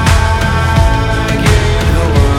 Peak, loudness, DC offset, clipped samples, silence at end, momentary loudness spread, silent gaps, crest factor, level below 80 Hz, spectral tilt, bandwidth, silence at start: 0 dBFS; -12 LUFS; under 0.1%; 0.2%; 0 s; 2 LU; none; 10 dB; -14 dBFS; -5.5 dB/octave; 15.5 kHz; 0 s